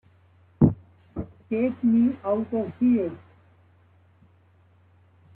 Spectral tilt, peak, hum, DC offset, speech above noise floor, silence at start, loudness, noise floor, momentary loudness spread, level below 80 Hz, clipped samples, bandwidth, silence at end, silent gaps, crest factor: -13 dB/octave; -4 dBFS; none; under 0.1%; 35 dB; 0.6 s; -24 LUFS; -59 dBFS; 17 LU; -52 dBFS; under 0.1%; 3.4 kHz; 2.15 s; none; 22 dB